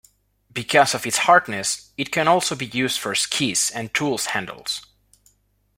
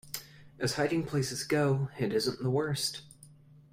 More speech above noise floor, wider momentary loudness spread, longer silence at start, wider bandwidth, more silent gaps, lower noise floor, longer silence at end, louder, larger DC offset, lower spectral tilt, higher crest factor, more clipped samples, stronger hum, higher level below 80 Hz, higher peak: first, 42 dB vs 25 dB; first, 11 LU vs 8 LU; first, 0.55 s vs 0.05 s; about the same, 16.5 kHz vs 16 kHz; neither; first, -63 dBFS vs -56 dBFS; first, 0.95 s vs 0.4 s; first, -21 LUFS vs -31 LUFS; neither; second, -2.5 dB/octave vs -5 dB/octave; about the same, 20 dB vs 18 dB; neither; first, 50 Hz at -55 dBFS vs none; about the same, -62 dBFS vs -64 dBFS; first, -2 dBFS vs -14 dBFS